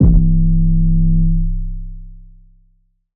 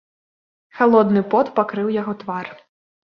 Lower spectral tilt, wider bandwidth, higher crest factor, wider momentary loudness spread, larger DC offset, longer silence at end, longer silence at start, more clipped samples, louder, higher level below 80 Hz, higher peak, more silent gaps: first, -17 dB/octave vs -9 dB/octave; second, 1.1 kHz vs 5.8 kHz; second, 12 dB vs 18 dB; first, 17 LU vs 14 LU; neither; first, 0.95 s vs 0.6 s; second, 0 s vs 0.75 s; neither; first, -16 LUFS vs -19 LUFS; first, -16 dBFS vs -66 dBFS; about the same, -2 dBFS vs -2 dBFS; neither